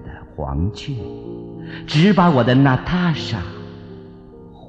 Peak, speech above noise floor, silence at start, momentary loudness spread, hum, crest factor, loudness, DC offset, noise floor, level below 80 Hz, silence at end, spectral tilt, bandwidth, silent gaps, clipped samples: -4 dBFS; 23 dB; 0 s; 22 LU; none; 16 dB; -18 LUFS; under 0.1%; -40 dBFS; -38 dBFS; 0 s; -7.5 dB/octave; 8 kHz; none; under 0.1%